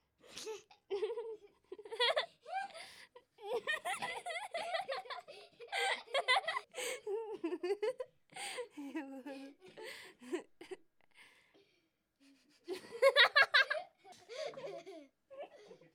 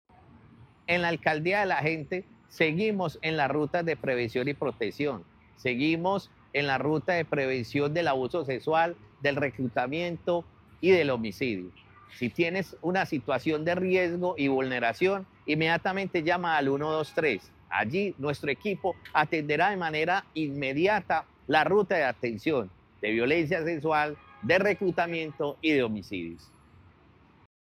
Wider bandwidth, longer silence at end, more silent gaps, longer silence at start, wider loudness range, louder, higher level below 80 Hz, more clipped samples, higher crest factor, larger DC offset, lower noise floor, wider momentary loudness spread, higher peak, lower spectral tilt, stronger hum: first, 17.5 kHz vs 14 kHz; second, 0.2 s vs 1.4 s; neither; about the same, 0.3 s vs 0.35 s; first, 16 LU vs 2 LU; second, -36 LUFS vs -28 LUFS; second, -88 dBFS vs -62 dBFS; neither; first, 26 dB vs 18 dB; neither; first, -79 dBFS vs -59 dBFS; first, 23 LU vs 7 LU; second, -14 dBFS vs -10 dBFS; second, -1 dB/octave vs -6.5 dB/octave; neither